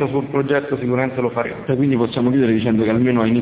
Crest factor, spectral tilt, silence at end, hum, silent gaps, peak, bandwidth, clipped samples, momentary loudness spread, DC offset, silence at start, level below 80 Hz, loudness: 14 dB; -11.5 dB/octave; 0 s; none; none; -4 dBFS; 4 kHz; under 0.1%; 5 LU; under 0.1%; 0 s; -48 dBFS; -18 LUFS